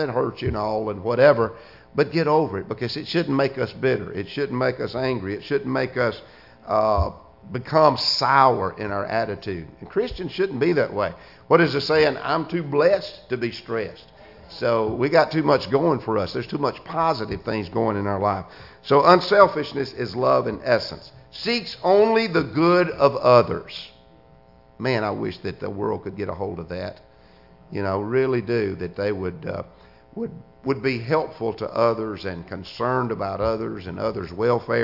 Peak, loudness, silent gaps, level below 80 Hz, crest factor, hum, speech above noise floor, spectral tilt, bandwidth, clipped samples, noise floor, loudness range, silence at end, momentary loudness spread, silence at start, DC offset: 0 dBFS; -22 LUFS; none; -48 dBFS; 22 dB; none; 30 dB; -7 dB/octave; 5.8 kHz; under 0.1%; -52 dBFS; 7 LU; 0 s; 15 LU; 0 s; under 0.1%